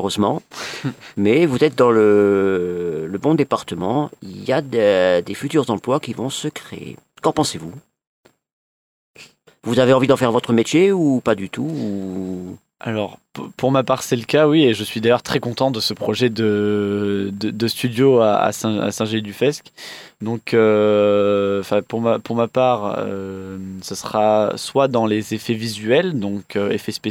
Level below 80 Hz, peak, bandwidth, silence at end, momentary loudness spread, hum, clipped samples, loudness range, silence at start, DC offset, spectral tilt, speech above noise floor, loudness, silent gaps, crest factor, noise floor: -60 dBFS; -2 dBFS; 17 kHz; 0 s; 14 LU; none; under 0.1%; 4 LU; 0 s; under 0.1%; -5.5 dB/octave; 28 dB; -18 LUFS; 8.07-8.23 s, 8.53-9.14 s; 16 dB; -47 dBFS